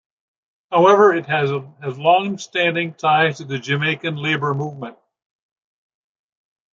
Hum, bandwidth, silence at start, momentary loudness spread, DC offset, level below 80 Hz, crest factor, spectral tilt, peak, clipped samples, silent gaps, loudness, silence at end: none; 7.6 kHz; 0.7 s; 13 LU; under 0.1%; -68 dBFS; 18 dB; -5.5 dB/octave; -2 dBFS; under 0.1%; none; -18 LUFS; 1.8 s